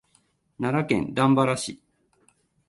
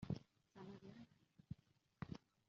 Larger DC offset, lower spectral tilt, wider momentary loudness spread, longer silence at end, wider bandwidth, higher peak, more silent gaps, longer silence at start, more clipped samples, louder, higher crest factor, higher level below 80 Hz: neither; second, -6 dB/octave vs -7.5 dB/octave; second, 10 LU vs 14 LU; first, 0.9 s vs 0.3 s; first, 11.5 kHz vs 7.2 kHz; first, -6 dBFS vs -32 dBFS; neither; first, 0.6 s vs 0 s; neither; first, -24 LUFS vs -57 LUFS; about the same, 20 dB vs 24 dB; first, -58 dBFS vs -76 dBFS